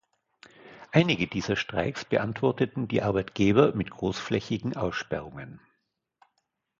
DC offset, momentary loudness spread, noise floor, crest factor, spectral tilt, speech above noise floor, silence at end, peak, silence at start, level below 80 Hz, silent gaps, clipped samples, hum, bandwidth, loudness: under 0.1%; 10 LU; -78 dBFS; 22 dB; -6.5 dB/octave; 51 dB; 1.2 s; -6 dBFS; 0.65 s; -54 dBFS; none; under 0.1%; none; 7.6 kHz; -27 LUFS